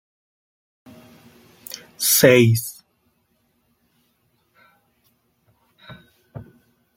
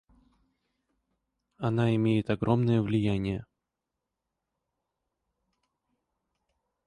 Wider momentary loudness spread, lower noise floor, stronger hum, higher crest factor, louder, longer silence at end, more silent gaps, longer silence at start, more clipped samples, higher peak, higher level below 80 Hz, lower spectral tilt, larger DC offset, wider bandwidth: first, 29 LU vs 9 LU; second, -67 dBFS vs -86 dBFS; neither; about the same, 22 dB vs 20 dB; first, -15 LUFS vs -28 LUFS; second, 0.55 s vs 3.45 s; neither; first, 2 s vs 1.6 s; neither; first, -2 dBFS vs -12 dBFS; second, -62 dBFS vs -56 dBFS; second, -4 dB/octave vs -8.5 dB/octave; neither; first, 16.5 kHz vs 10 kHz